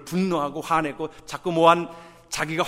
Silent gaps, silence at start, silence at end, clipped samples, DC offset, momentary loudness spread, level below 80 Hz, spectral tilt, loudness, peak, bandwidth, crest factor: none; 0 s; 0 s; under 0.1%; under 0.1%; 15 LU; -56 dBFS; -5 dB/octave; -23 LUFS; -2 dBFS; 16 kHz; 22 dB